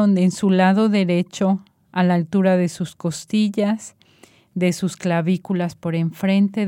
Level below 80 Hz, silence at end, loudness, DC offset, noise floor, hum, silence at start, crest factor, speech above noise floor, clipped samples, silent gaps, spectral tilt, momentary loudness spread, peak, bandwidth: -64 dBFS; 0 s; -20 LUFS; under 0.1%; -52 dBFS; none; 0 s; 16 dB; 34 dB; under 0.1%; none; -6.5 dB/octave; 9 LU; -4 dBFS; 13 kHz